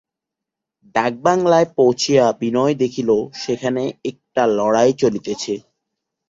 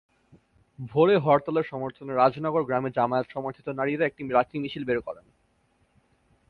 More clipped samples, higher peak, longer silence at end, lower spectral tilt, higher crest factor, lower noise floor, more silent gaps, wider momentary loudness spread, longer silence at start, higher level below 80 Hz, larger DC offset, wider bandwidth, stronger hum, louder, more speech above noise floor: neither; first, -2 dBFS vs -6 dBFS; second, 0.7 s vs 1.35 s; second, -5 dB/octave vs -9 dB/octave; about the same, 16 dB vs 20 dB; first, -84 dBFS vs -67 dBFS; neither; about the same, 10 LU vs 12 LU; first, 0.95 s vs 0.8 s; first, -58 dBFS vs -64 dBFS; neither; first, 7.8 kHz vs 4.9 kHz; neither; first, -18 LUFS vs -26 LUFS; first, 67 dB vs 42 dB